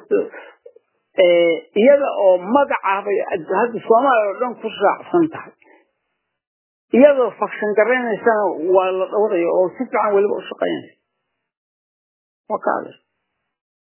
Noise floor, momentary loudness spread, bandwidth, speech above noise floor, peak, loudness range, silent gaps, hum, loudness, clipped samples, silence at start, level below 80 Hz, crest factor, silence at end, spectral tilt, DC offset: -76 dBFS; 10 LU; 3.2 kHz; 59 dB; 0 dBFS; 7 LU; 6.47-6.88 s, 11.57-12.44 s; none; -17 LUFS; under 0.1%; 0.1 s; -72 dBFS; 18 dB; 1 s; -9 dB/octave; under 0.1%